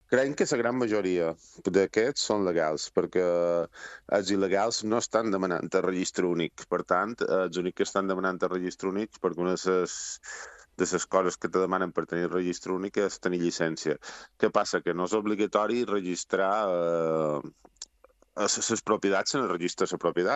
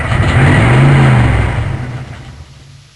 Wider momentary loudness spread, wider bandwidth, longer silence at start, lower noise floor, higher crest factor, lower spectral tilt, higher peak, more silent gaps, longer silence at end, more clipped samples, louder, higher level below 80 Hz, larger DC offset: second, 7 LU vs 18 LU; second, 8.6 kHz vs 11 kHz; about the same, 0.1 s vs 0 s; first, -62 dBFS vs -37 dBFS; first, 20 dB vs 10 dB; second, -4 dB/octave vs -7 dB/octave; second, -8 dBFS vs 0 dBFS; neither; second, 0 s vs 0.5 s; neither; second, -28 LUFS vs -10 LUFS; second, -68 dBFS vs -22 dBFS; neither